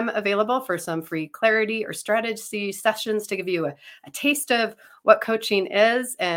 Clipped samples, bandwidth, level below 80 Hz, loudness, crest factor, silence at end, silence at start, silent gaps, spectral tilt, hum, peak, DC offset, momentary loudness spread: under 0.1%; 17 kHz; -74 dBFS; -23 LUFS; 22 dB; 0 s; 0 s; none; -3.5 dB/octave; none; -2 dBFS; under 0.1%; 9 LU